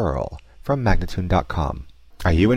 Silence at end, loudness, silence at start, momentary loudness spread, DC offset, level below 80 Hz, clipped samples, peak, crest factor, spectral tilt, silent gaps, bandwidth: 0 s; -23 LUFS; 0 s; 11 LU; under 0.1%; -28 dBFS; under 0.1%; -6 dBFS; 14 dB; -7.5 dB/octave; none; 14 kHz